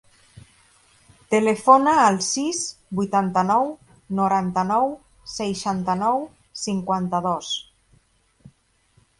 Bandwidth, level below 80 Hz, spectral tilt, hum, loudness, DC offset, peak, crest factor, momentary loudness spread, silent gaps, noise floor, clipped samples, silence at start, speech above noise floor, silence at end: 11.5 kHz; -60 dBFS; -4.5 dB/octave; none; -21 LUFS; under 0.1%; -2 dBFS; 22 dB; 13 LU; none; -62 dBFS; under 0.1%; 0.35 s; 41 dB; 1.55 s